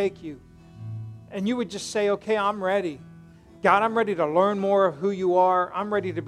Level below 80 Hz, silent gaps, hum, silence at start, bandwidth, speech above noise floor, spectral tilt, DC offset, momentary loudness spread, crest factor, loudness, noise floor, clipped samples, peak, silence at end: -62 dBFS; none; none; 0 s; 12 kHz; 25 dB; -5.5 dB/octave; under 0.1%; 17 LU; 20 dB; -24 LUFS; -48 dBFS; under 0.1%; -4 dBFS; 0 s